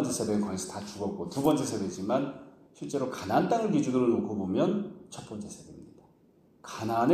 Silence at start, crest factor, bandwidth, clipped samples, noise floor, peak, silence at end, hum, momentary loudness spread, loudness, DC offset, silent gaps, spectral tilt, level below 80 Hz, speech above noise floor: 0 s; 20 dB; 15.5 kHz; under 0.1%; -62 dBFS; -10 dBFS; 0 s; none; 17 LU; -30 LUFS; under 0.1%; none; -6 dB/octave; -66 dBFS; 33 dB